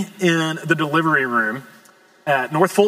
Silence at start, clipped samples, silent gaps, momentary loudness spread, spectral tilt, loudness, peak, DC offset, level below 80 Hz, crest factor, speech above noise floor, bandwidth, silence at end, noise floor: 0 s; under 0.1%; none; 7 LU; -5 dB/octave; -19 LUFS; -2 dBFS; under 0.1%; -78 dBFS; 18 dB; 32 dB; 16 kHz; 0 s; -51 dBFS